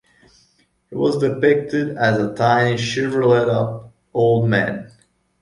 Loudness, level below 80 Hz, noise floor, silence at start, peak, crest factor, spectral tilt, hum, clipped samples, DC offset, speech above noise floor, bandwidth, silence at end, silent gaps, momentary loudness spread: -18 LUFS; -54 dBFS; -61 dBFS; 0.9 s; -2 dBFS; 16 dB; -6.5 dB/octave; none; under 0.1%; under 0.1%; 43 dB; 11.5 kHz; 0.55 s; none; 10 LU